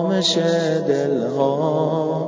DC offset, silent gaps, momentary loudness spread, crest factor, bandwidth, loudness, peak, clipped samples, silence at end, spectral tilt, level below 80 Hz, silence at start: under 0.1%; none; 3 LU; 14 dB; 7.8 kHz; -19 LUFS; -6 dBFS; under 0.1%; 0 s; -5.5 dB/octave; -66 dBFS; 0 s